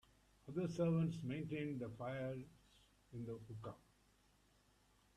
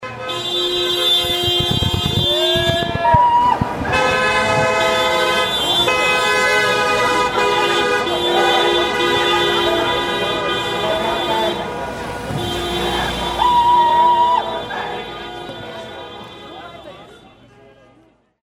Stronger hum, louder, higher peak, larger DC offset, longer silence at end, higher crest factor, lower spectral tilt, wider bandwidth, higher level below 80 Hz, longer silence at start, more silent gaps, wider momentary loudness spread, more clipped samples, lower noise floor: first, 50 Hz at -70 dBFS vs none; second, -44 LUFS vs -16 LUFS; second, -28 dBFS vs 0 dBFS; neither; first, 1.4 s vs 1.25 s; about the same, 18 dB vs 18 dB; first, -8 dB/octave vs -3.5 dB/octave; second, 10.5 kHz vs 16.5 kHz; second, -72 dBFS vs -40 dBFS; first, 0.45 s vs 0 s; neither; about the same, 18 LU vs 16 LU; neither; first, -74 dBFS vs -54 dBFS